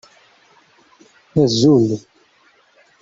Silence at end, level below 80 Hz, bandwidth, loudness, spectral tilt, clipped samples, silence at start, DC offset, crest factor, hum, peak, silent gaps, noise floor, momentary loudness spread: 1.05 s; -56 dBFS; 7.8 kHz; -16 LUFS; -6.5 dB/octave; under 0.1%; 1.35 s; under 0.1%; 18 dB; none; -2 dBFS; none; -55 dBFS; 11 LU